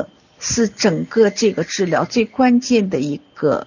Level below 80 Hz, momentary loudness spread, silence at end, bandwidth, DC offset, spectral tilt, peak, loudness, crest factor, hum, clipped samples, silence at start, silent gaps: -50 dBFS; 7 LU; 0 s; 7.4 kHz; under 0.1%; -4.5 dB/octave; -2 dBFS; -17 LUFS; 14 dB; none; under 0.1%; 0 s; none